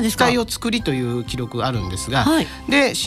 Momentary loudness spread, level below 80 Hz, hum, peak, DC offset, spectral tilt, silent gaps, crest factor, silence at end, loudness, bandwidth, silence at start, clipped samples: 8 LU; -38 dBFS; none; -6 dBFS; under 0.1%; -4.5 dB/octave; none; 14 dB; 0 s; -20 LUFS; 15.5 kHz; 0 s; under 0.1%